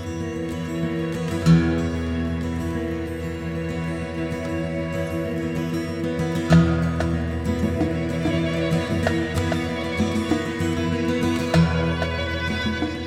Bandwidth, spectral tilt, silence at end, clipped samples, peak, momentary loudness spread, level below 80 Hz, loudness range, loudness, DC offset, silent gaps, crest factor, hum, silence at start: 13.5 kHz; -6.5 dB/octave; 0 s; under 0.1%; -4 dBFS; 9 LU; -38 dBFS; 5 LU; -23 LUFS; under 0.1%; none; 18 dB; none; 0 s